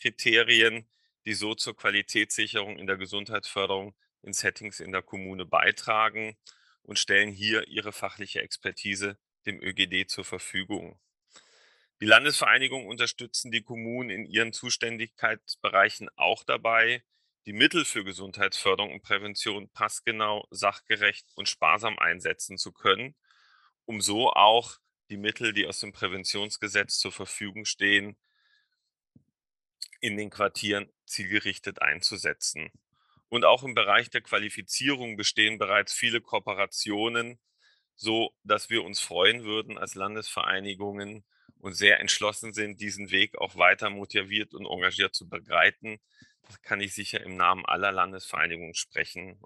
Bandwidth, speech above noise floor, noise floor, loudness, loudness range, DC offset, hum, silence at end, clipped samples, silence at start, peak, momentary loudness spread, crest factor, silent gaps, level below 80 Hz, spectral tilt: 12.5 kHz; 54 dB; -82 dBFS; -26 LUFS; 5 LU; under 0.1%; none; 0.1 s; under 0.1%; 0 s; -2 dBFS; 13 LU; 26 dB; none; -72 dBFS; -2 dB/octave